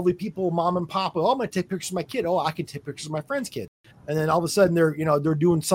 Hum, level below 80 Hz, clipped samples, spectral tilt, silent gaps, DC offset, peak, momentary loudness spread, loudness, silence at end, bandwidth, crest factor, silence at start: none; -60 dBFS; under 0.1%; -5.5 dB/octave; 3.68-3.84 s; under 0.1%; -8 dBFS; 13 LU; -24 LUFS; 0 s; 16.5 kHz; 16 dB; 0 s